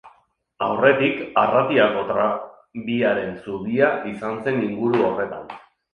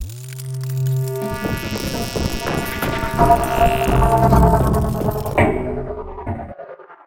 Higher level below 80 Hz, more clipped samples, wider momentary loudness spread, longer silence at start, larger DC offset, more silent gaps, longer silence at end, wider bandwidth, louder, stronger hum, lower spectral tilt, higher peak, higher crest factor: second, -60 dBFS vs -26 dBFS; neither; about the same, 13 LU vs 15 LU; about the same, 0.05 s vs 0 s; neither; neither; first, 0.35 s vs 0.1 s; second, 6.6 kHz vs 17 kHz; about the same, -21 LUFS vs -19 LUFS; neither; about the same, -7.5 dB/octave vs -6.5 dB/octave; about the same, -2 dBFS vs 0 dBFS; about the same, 18 dB vs 18 dB